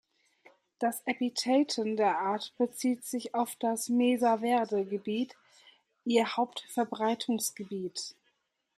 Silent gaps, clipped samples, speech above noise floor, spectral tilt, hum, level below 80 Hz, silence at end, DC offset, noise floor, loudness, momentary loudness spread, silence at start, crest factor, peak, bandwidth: none; under 0.1%; 46 dB; -3.5 dB/octave; none; -82 dBFS; 0.65 s; under 0.1%; -76 dBFS; -31 LUFS; 9 LU; 0.8 s; 18 dB; -14 dBFS; 15.5 kHz